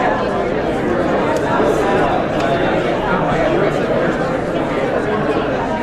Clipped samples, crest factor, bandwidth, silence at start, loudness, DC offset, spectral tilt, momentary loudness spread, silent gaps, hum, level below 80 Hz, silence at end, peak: under 0.1%; 14 dB; 14 kHz; 0 s; -17 LUFS; under 0.1%; -6.5 dB/octave; 3 LU; none; none; -36 dBFS; 0 s; -2 dBFS